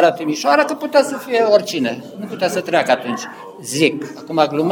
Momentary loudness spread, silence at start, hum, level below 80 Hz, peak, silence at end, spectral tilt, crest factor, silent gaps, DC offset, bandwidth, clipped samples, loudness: 13 LU; 0 s; none; -68 dBFS; 0 dBFS; 0 s; -4 dB/octave; 18 dB; none; under 0.1%; over 20 kHz; under 0.1%; -17 LUFS